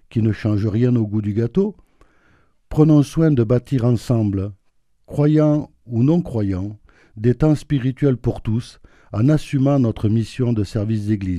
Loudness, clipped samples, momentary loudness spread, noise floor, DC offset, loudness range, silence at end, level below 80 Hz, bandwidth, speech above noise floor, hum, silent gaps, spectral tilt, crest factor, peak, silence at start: -19 LUFS; under 0.1%; 10 LU; -64 dBFS; under 0.1%; 2 LU; 0 s; -40 dBFS; 11.5 kHz; 46 dB; none; none; -9 dB/octave; 18 dB; 0 dBFS; 0.15 s